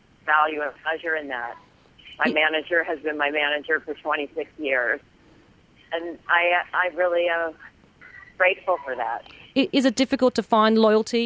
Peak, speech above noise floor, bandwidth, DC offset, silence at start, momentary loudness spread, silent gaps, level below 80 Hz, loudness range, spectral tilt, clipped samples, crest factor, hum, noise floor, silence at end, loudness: -6 dBFS; 32 dB; 8 kHz; under 0.1%; 0.25 s; 11 LU; none; -62 dBFS; 3 LU; -4 dB/octave; under 0.1%; 18 dB; none; -55 dBFS; 0 s; -23 LUFS